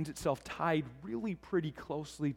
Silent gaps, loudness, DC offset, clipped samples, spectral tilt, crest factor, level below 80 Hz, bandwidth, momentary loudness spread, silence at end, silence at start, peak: none; -37 LUFS; under 0.1%; under 0.1%; -6 dB/octave; 18 dB; -62 dBFS; 16.5 kHz; 8 LU; 0 s; 0 s; -18 dBFS